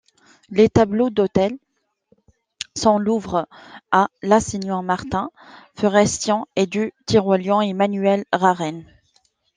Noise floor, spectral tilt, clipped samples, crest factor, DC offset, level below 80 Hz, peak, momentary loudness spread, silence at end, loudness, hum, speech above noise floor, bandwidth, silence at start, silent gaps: -63 dBFS; -5 dB/octave; under 0.1%; 18 dB; under 0.1%; -50 dBFS; -2 dBFS; 9 LU; 0.7 s; -19 LUFS; none; 44 dB; 10 kHz; 0.5 s; none